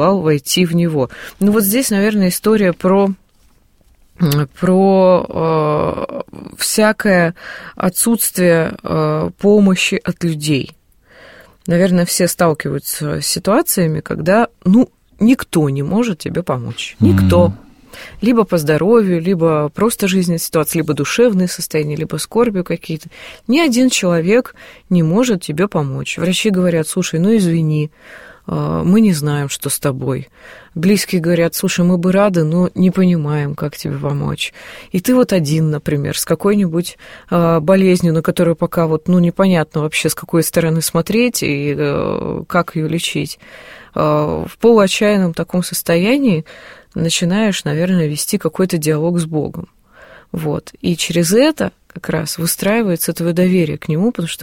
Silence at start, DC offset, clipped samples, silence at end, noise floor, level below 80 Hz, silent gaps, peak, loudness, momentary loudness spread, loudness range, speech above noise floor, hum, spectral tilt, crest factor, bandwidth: 0 s; under 0.1%; under 0.1%; 0 s; -52 dBFS; -46 dBFS; none; 0 dBFS; -15 LUFS; 9 LU; 3 LU; 37 dB; none; -5.5 dB/octave; 14 dB; 16.5 kHz